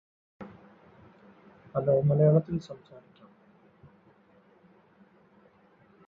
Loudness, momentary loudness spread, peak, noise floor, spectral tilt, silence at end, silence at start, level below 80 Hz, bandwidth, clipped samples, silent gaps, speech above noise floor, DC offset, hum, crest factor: -26 LUFS; 26 LU; -10 dBFS; -61 dBFS; -10.5 dB/octave; 3.3 s; 0.4 s; -64 dBFS; 6.6 kHz; under 0.1%; none; 36 dB; under 0.1%; none; 22 dB